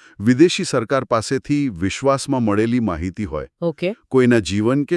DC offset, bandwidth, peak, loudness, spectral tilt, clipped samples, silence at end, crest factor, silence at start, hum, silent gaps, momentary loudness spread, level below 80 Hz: under 0.1%; 12 kHz; 0 dBFS; -19 LUFS; -6 dB/octave; under 0.1%; 0 s; 18 dB; 0.2 s; none; none; 10 LU; -46 dBFS